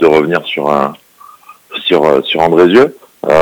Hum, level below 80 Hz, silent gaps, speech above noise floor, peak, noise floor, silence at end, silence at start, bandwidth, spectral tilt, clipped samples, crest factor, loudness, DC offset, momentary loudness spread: none; -48 dBFS; none; 29 dB; 0 dBFS; -38 dBFS; 0 s; 0 s; 19.5 kHz; -6 dB/octave; 2%; 12 dB; -11 LUFS; under 0.1%; 12 LU